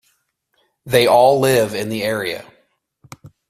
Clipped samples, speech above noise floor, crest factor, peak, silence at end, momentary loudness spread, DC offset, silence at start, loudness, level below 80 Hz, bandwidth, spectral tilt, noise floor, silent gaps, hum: under 0.1%; 51 dB; 18 dB; 0 dBFS; 0.2 s; 12 LU; under 0.1%; 0.85 s; -16 LUFS; -56 dBFS; 16 kHz; -4.5 dB/octave; -66 dBFS; none; none